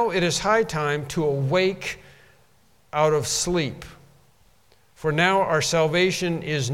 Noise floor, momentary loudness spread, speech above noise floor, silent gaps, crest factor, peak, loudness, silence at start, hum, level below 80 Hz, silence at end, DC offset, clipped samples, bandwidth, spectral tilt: -61 dBFS; 11 LU; 38 dB; none; 20 dB; -4 dBFS; -22 LUFS; 0 s; none; -52 dBFS; 0 s; 0.1%; under 0.1%; 16.5 kHz; -4 dB/octave